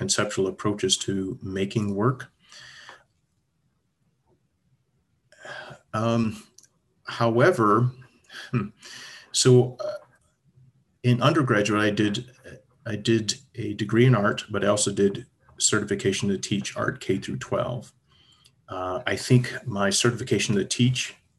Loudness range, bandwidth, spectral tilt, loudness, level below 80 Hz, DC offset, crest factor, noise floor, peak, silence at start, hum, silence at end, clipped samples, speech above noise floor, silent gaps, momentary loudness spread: 9 LU; 12.5 kHz; -4.5 dB/octave; -24 LUFS; -56 dBFS; under 0.1%; 20 dB; -72 dBFS; -6 dBFS; 0 s; none; 0.25 s; under 0.1%; 48 dB; none; 19 LU